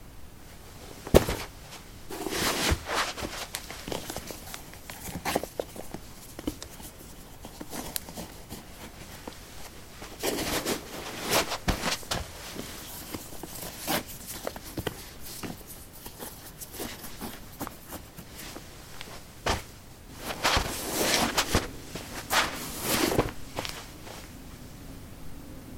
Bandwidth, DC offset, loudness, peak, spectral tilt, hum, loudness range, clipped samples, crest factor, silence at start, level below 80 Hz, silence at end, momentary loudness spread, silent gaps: 17 kHz; under 0.1%; -31 LUFS; -2 dBFS; -3 dB/octave; none; 12 LU; under 0.1%; 32 dB; 0 s; -44 dBFS; 0 s; 19 LU; none